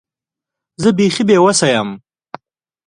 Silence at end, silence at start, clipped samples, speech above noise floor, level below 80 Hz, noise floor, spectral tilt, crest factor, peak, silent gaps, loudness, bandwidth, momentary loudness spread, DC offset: 0.9 s; 0.8 s; under 0.1%; 74 dB; -56 dBFS; -86 dBFS; -4.5 dB/octave; 16 dB; 0 dBFS; none; -13 LUFS; 11.5 kHz; 12 LU; under 0.1%